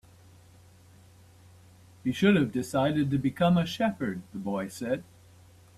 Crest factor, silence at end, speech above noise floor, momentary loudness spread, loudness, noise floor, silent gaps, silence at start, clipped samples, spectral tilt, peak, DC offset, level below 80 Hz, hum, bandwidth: 18 dB; 0.75 s; 28 dB; 11 LU; -28 LUFS; -55 dBFS; none; 2.05 s; under 0.1%; -6.5 dB/octave; -10 dBFS; under 0.1%; -60 dBFS; none; 13.5 kHz